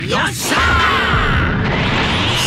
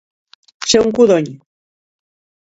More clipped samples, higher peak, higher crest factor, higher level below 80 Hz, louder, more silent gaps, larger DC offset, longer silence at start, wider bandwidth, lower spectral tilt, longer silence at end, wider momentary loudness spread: neither; about the same, -2 dBFS vs 0 dBFS; second, 12 dB vs 18 dB; first, -26 dBFS vs -52 dBFS; about the same, -14 LUFS vs -13 LUFS; neither; neither; second, 0 s vs 0.6 s; first, 16 kHz vs 8 kHz; about the same, -4 dB/octave vs -4 dB/octave; second, 0 s vs 1.15 s; second, 4 LU vs 13 LU